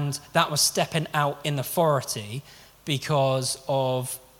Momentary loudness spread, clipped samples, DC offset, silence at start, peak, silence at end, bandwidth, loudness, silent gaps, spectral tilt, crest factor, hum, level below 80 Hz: 10 LU; under 0.1%; under 0.1%; 0 s; -4 dBFS; 0.2 s; 18.5 kHz; -25 LUFS; none; -4 dB/octave; 22 dB; none; -62 dBFS